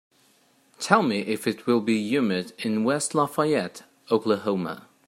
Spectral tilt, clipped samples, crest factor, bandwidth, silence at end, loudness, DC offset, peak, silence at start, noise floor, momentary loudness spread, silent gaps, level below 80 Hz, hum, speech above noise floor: -5 dB/octave; under 0.1%; 24 dB; 16 kHz; 0.25 s; -25 LUFS; under 0.1%; -2 dBFS; 0.8 s; -62 dBFS; 7 LU; none; -72 dBFS; none; 38 dB